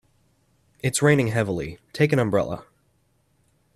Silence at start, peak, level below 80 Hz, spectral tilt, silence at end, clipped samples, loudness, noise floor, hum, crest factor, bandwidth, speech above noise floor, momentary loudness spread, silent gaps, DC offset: 0.85 s; -4 dBFS; -54 dBFS; -5.5 dB/octave; 1.15 s; under 0.1%; -23 LUFS; -66 dBFS; none; 20 dB; 13.5 kHz; 44 dB; 12 LU; none; under 0.1%